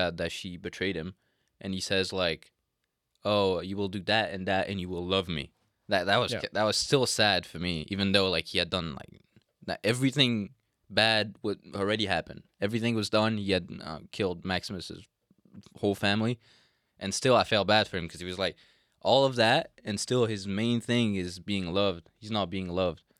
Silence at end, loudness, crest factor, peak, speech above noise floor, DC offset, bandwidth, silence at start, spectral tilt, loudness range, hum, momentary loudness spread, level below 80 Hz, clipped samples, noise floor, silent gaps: 0.25 s; -28 LUFS; 22 dB; -6 dBFS; 53 dB; under 0.1%; 15.5 kHz; 0 s; -4.5 dB/octave; 5 LU; none; 14 LU; -62 dBFS; under 0.1%; -82 dBFS; none